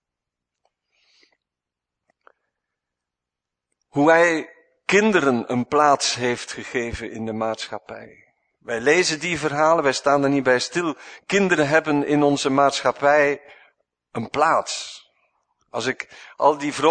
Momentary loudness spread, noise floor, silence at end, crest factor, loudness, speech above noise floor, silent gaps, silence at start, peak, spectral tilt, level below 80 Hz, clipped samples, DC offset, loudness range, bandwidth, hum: 14 LU; -86 dBFS; 0 s; 20 dB; -20 LUFS; 66 dB; none; 3.95 s; -2 dBFS; -4 dB/octave; -58 dBFS; under 0.1%; under 0.1%; 5 LU; 9.6 kHz; none